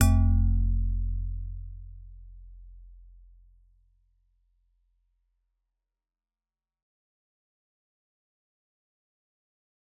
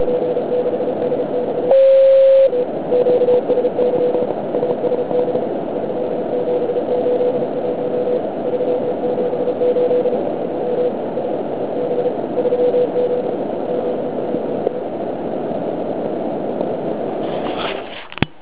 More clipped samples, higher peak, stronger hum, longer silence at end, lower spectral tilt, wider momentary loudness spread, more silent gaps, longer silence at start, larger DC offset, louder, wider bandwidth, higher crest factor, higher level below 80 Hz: neither; second, -6 dBFS vs 0 dBFS; neither; first, 7.1 s vs 0.15 s; second, -8 dB/octave vs -10.5 dB/octave; first, 27 LU vs 8 LU; neither; about the same, 0 s vs 0 s; second, under 0.1% vs 1%; second, -28 LUFS vs -18 LUFS; about the same, 4 kHz vs 4 kHz; first, 24 dB vs 18 dB; first, -34 dBFS vs -54 dBFS